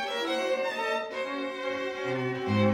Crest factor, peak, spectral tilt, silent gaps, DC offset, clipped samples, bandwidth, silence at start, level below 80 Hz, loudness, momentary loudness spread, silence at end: 16 dB; -14 dBFS; -5.5 dB/octave; none; under 0.1%; under 0.1%; 16 kHz; 0 s; -72 dBFS; -30 LUFS; 4 LU; 0 s